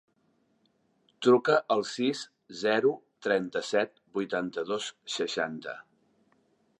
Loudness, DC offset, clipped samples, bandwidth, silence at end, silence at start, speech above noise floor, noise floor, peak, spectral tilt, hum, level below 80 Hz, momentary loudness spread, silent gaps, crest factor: -29 LUFS; under 0.1%; under 0.1%; 10.5 kHz; 1 s; 1.2 s; 43 dB; -71 dBFS; -10 dBFS; -4 dB/octave; none; -78 dBFS; 12 LU; none; 20 dB